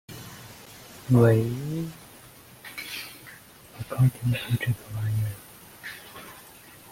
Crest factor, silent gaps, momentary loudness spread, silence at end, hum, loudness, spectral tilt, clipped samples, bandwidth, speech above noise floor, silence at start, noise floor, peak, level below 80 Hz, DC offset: 22 dB; none; 25 LU; 0 s; none; -26 LUFS; -7 dB/octave; under 0.1%; 16.5 kHz; 26 dB; 0.1 s; -49 dBFS; -6 dBFS; -56 dBFS; under 0.1%